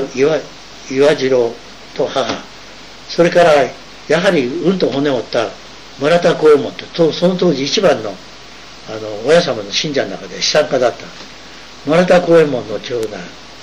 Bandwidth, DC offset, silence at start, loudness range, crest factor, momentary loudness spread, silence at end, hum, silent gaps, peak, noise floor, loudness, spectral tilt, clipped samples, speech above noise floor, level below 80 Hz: 11.5 kHz; 0.9%; 0 s; 2 LU; 14 dB; 22 LU; 0 s; none; none; -2 dBFS; -36 dBFS; -14 LUFS; -4.5 dB/octave; under 0.1%; 22 dB; -48 dBFS